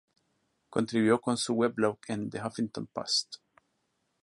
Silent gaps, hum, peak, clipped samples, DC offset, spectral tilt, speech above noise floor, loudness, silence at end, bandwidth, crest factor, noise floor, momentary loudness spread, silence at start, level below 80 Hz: none; none; -10 dBFS; under 0.1%; under 0.1%; -4.5 dB/octave; 48 dB; -30 LUFS; 0.9 s; 11.5 kHz; 22 dB; -77 dBFS; 10 LU; 0.7 s; -70 dBFS